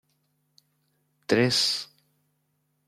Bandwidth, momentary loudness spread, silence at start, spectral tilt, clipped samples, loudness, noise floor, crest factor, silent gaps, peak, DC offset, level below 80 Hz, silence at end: 16 kHz; 22 LU; 1.3 s; -3.5 dB/octave; under 0.1%; -24 LUFS; -74 dBFS; 22 dB; none; -8 dBFS; under 0.1%; -72 dBFS; 1.05 s